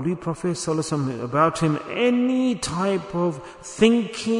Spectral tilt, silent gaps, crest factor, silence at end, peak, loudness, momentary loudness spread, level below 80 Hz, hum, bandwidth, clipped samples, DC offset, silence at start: -5.5 dB/octave; none; 20 dB; 0 s; -4 dBFS; -22 LUFS; 8 LU; -54 dBFS; none; 11 kHz; under 0.1%; under 0.1%; 0 s